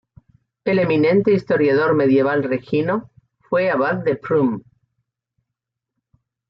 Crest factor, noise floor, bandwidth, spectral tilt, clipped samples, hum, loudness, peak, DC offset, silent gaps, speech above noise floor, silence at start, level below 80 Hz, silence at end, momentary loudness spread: 14 dB; -82 dBFS; 5.8 kHz; -9.5 dB/octave; under 0.1%; none; -18 LUFS; -6 dBFS; under 0.1%; none; 65 dB; 0.65 s; -60 dBFS; 1.9 s; 7 LU